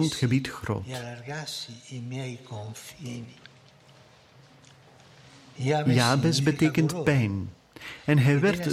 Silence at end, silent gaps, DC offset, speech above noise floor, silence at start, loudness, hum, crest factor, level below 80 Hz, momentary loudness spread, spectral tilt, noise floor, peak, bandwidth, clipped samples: 0 s; none; under 0.1%; 29 dB; 0 s; -26 LUFS; none; 20 dB; -58 dBFS; 18 LU; -5.5 dB/octave; -55 dBFS; -8 dBFS; 15 kHz; under 0.1%